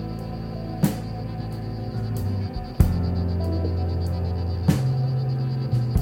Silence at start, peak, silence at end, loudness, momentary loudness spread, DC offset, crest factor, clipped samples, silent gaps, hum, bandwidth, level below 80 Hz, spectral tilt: 0 s; -4 dBFS; 0 s; -26 LUFS; 9 LU; under 0.1%; 20 dB; under 0.1%; none; none; 17 kHz; -34 dBFS; -8 dB/octave